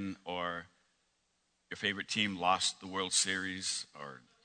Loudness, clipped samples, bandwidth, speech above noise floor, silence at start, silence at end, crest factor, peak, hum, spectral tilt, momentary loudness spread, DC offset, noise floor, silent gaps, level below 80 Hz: -33 LUFS; under 0.1%; 9.6 kHz; 43 dB; 0 s; 0.25 s; 24 dB; -14 dBFS; none; -1.5 dB/octave; 16 LU; under 0.1%; -78 dBFS; none; -76 dBFS